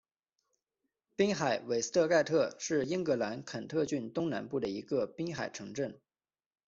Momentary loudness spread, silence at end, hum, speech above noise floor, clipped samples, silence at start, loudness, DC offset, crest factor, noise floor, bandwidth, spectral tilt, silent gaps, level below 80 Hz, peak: 11 LU; 0.7 s; none; over 57 dB; under 0.1%; 1.2 s; -33 LUFS; under 0.1%; 18 dB; under -90 dBFS; 7.8 kHz; -4.5 dB/octave; none; -72 dBFS; -16 dBFS